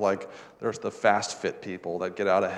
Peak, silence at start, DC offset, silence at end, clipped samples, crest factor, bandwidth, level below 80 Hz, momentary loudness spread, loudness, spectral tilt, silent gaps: -6 dBFS; 0 s; under 0.1%; 0 s; under 0.1%; 22 dB; 11 kHz; -74 dBFS; 10 LU; -28 LUFS; -4 dB/octave; none